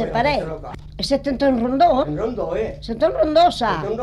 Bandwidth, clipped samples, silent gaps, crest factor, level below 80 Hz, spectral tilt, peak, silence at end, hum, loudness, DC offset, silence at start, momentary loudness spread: 12 kHz; under 0.1%; none; 14 dB; -38 dBFS; -6 dB/octave; -6 dBFS; 0 s; none; -19 LUFS; under 0.1%; 0 s; 11 LU